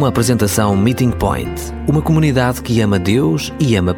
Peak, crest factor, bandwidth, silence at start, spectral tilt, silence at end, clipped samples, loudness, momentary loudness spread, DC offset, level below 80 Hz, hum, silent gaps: -2 dBFS; 12 dB; 18 kHz; 0 s; -6 dB/octave; 0 s; under 0.1%; -15 LUFS; 5 LU; under 0.1%; -32 dBFS; none; none